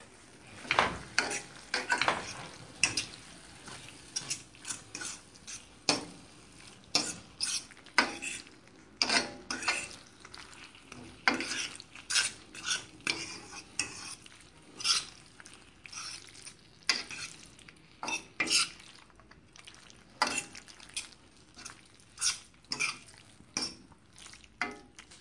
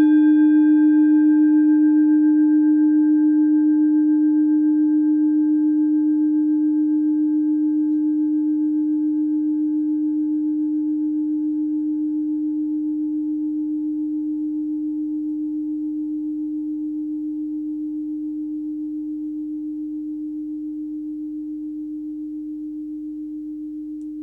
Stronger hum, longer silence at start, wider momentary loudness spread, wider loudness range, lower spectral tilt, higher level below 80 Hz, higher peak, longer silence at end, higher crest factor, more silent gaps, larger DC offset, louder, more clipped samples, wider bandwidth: neither; about the same, 0 s vs 0 s; first, 23 LU vs 15 LU; second, 5 LU vs 13 LU; second, -0.5 dB/octave vs -9 dB/octave; second, -66 dBFS vs -60 dBFS; about the same, -8 dBFS vs -8 dBFS; about the same, 0 s vs 0 s; first, 30 dB vs 10 dB; neither; neither; second, -33 LUFS vs -20 LUFS; neither; first, 11.5 kHz vs 1.7 kHz